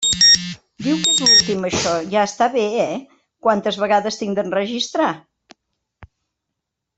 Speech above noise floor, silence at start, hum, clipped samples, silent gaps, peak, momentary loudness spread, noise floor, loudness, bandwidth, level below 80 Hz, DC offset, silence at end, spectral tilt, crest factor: 61 dB; 0 s; none; under 0.1%; none; -2 dBFS; 12 LU; -80 dBFS; -16 LUFS; 8.4 kHz; -54 dBFS; under 0.1%; 0.9 s; -2 dB/octave; 16 dB